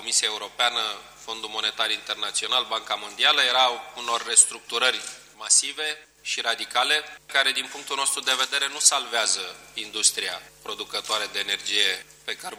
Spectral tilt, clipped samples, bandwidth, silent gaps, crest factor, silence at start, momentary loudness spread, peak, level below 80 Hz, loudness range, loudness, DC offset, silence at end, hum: 2.5 dB/octave; under 0.1%; over 20 kHz; none; 24 dB; 0 s; 14 LU; 0 dBFS; -68 dBFS; 4 LU; -22 LUFS; under 0.1%; 0 s; none